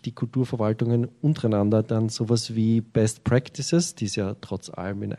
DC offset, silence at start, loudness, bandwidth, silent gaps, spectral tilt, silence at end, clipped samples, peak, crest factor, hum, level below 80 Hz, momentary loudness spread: under 0.1%; 0.05 s; -25 LUFS; 12.5 kHz; none; -6 dB/octave; 0 s; under 0.1%; -8 dBFS; 16 dB; none; -54 dBFS; 8 LU